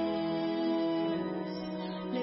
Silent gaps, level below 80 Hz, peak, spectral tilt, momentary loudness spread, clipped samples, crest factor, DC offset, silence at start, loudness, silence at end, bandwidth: none; -68 dBFS; -22 dBFS; -5 dB/octave; 7 LU; under 0.1%; 12 dB; under 0.1%; 0 s; -33 LUFS; 0 s; 5.8 kHz